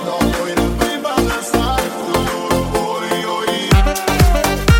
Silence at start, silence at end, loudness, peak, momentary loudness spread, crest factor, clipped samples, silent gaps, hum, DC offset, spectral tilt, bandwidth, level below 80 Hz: 0 s; 0 s; -17 LUFS; 0 dBFS; 5 LU; 14 dB; under 0.1%; none; none; under 0.1%; -5 dB/octave; 17 kHz; -22 dBFS